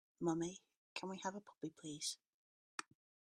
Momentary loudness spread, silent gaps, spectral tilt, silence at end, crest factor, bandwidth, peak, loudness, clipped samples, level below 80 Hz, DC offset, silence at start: 11 LU; 0.77-0.96 s, 2.29-2.78 s; -4 dB/octave; 0.4 s; 22 dB; 13 kHz; -26 dBFS; -46 LUFS; under 0.1%; -82 dBFS; under 0.1%; 0.2 s